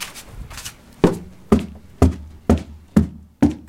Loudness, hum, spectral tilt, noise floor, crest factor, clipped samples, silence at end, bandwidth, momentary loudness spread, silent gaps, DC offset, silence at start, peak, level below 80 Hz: -20 LUFS; none; -7 dB/octave; -37 dBFS; 20 dB; under 0.1%; 0.1 s; 16 kHz; 16 LU; none; under 0.1%; 0 s; 0 dBFS; -30 dBFS